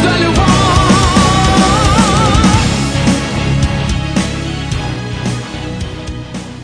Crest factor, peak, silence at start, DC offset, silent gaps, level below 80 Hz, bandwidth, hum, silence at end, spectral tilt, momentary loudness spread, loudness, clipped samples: 12 dB; 0 dBFS; 0 s; under 0.1%; none; -22 dBFS; 10.5 kHz; none; 0 s; -5 dB/octave; 13 LU; -12 LUFS; under 0.1%